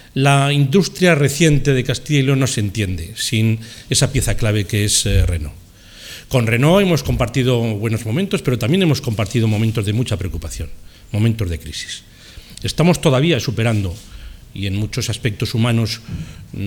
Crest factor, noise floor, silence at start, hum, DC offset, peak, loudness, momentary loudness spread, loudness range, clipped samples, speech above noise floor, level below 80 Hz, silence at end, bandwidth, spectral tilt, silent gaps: 18 dB; -39 dBFS; 0.15 s; none; under 0.1%; 0 dBFS; -17 LUFS; 13 LU; 5 LU; under 0.1%; 23 dB; -32 dBFS; 0 s; 18 kHz; -5 dB/octave; none